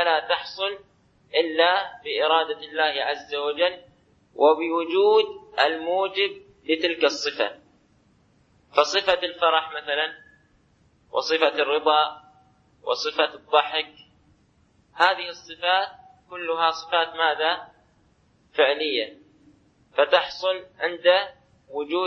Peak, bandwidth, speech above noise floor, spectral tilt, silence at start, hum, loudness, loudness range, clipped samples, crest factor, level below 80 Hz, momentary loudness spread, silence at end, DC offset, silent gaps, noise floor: -2 dBFS; 8 kHz; 39 dB; -2 dB/octave; 0 s; none; -23 LUFS; 3 LU; under 0.1%; 22 dB; -68 dBFS; 10 LU; 0 s; under 0.1%; none; -62 dBFS